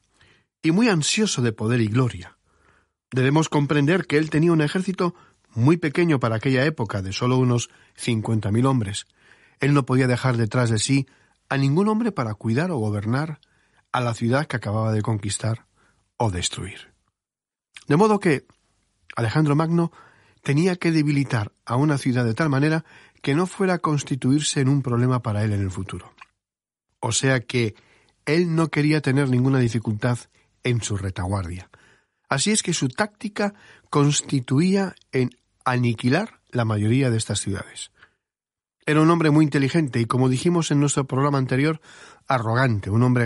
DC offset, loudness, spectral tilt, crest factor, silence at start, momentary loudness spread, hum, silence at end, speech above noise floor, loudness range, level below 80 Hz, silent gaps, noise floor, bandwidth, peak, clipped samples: under 0.1%; -22 LUFS; -5.5 dB/octave; 18 dB; 0.65 s; 9 LU; none; 0 s; over 69 dB; 4 LU; -56 dBFS; none; under -90 dBFS; 11.5 kHz; -4 dBFS; under 0.1%